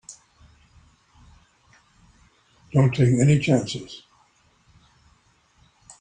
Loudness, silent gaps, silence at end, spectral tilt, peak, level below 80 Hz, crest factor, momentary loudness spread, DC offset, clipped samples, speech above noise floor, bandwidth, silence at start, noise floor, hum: -21 LUFS; none; 2.05 s; -6.5 dB/octave; -6 dBFS; -56 dBFS; 20 dB; 24 LU; under 0.1%; under 0.1%; 42 dB; 9.6 kHz; 0.1 s; -61 dBFS; none